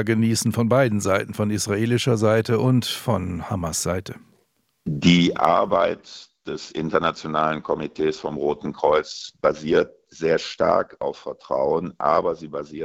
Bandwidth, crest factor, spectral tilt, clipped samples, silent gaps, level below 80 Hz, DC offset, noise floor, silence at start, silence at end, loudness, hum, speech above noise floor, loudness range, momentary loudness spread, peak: 16.5 kHz; 20 dB; -5.5 dB/octave; under 0.1%; none; -54 dBFS; under 0.1%; -67 dBFS; 0 s; 0 s; -22 LUFS; none; 45 dB; 3 LU; 12 LU; -2 dBFS